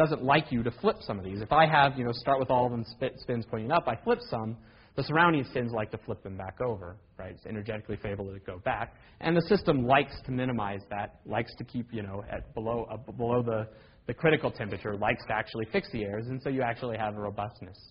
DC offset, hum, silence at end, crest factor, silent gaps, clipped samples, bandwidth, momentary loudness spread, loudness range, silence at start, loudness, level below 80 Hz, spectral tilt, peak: under 0.1%; none; 0.05 s; 22 dB; none; under 0.1%; 5.4 kHz; 15 LU; 7 LU; 0 s; -30 LUFS; -54 dBFS; -4.5 dB/octave; -8 dBFS